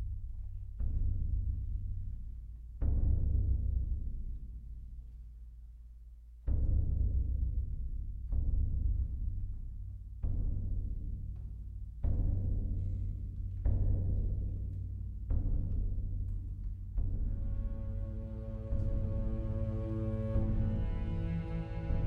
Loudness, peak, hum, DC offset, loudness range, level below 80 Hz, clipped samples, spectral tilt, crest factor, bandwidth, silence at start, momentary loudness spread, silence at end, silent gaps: -38 LUFS; -20 dBFS; none; under 0.1%; 3 LU; -36 dBFS; under 0.1%; -11 dB/octave; 14 dB; 3.1 kHz; 0 s; 13 LU; 0 s; none